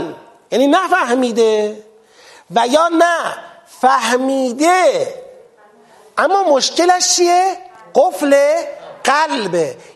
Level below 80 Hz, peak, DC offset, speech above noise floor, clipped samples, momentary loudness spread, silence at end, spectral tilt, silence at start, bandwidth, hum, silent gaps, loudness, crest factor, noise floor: -68 dBFS; 0 dBFS; under 0.1%; 33 dB; under 0.1%; 11 LU; 0.2 s; -2 dB/octave; 0 s; 13 kHz; none; none; -14 LUFS; 16 dB; -47 dBFS